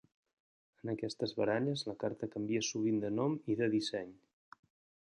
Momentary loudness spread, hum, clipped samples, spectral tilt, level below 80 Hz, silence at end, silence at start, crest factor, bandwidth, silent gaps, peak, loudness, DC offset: 8 LU; none; under 0.1%; -5 dB/octave; -74 dBFS; 1.05 s; 0.85 s; 18 dB; 10.5 kHz; none; -20 dBFS; -36 LUFS; under 0.1%